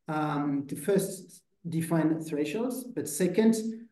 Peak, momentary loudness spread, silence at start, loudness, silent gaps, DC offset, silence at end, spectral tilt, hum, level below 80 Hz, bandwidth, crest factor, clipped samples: -12 dBFS; 10 LU; 0.1 s; -29 LUFS; none; under 0.1%; 0.05 s; -6 dB/octave; none; -76 dBFS; 12.5 kHz; 18 dB; under 0.1%